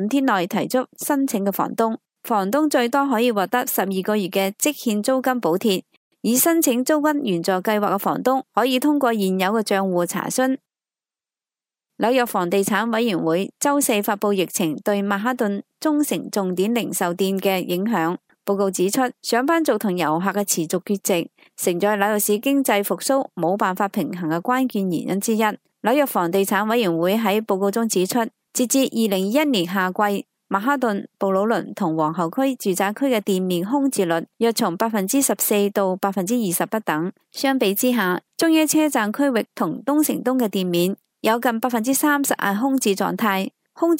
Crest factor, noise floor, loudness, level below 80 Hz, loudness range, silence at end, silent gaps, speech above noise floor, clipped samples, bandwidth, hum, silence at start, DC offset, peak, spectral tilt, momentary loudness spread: 18 dB; under -90 dBFS; -21 LUFS; -74 dBFS; 2 LU; 0 s; 5.97-6.11 s; over 70 dB; under 0.1%; 16 kHz; none; 0 s; under 0.1%; -2 dBFS; -4 dB/octave; 5 LU